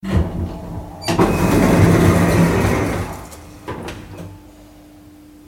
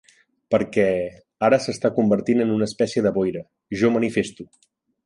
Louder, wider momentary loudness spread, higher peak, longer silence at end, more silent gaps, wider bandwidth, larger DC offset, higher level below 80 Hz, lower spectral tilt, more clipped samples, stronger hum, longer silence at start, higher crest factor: first, -16 LUFS vs -21 LUFS; first, 22 LU vs 7 LU; first, 0 dBFS vs -6 dBFS; first, 1.1 s vs 0.6 s; neither; first, 17 kHz vs 11 kHz; neither; first, -30 dBFS vs -56 dBFS; about the same, -6.5 dB/octave vs -6 dB/octave; neither; neither; second, 0.05 s vs 0.5 s; about the same, 18 dB vs 16 dB